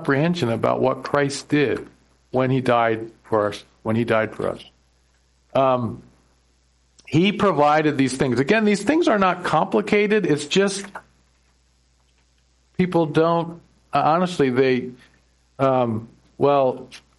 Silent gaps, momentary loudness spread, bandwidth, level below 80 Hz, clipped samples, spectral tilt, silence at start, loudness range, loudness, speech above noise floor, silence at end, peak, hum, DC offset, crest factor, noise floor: none; 11 LU; 11.5 kHz; -56 dBFS; under 0.1%; -6 dB/octave; 0 s; 6 LU; -20 LUFS; 41 dB; 0.2 s; -4 dBFS; none; under 0.1%; 16 dB; -61 dBFS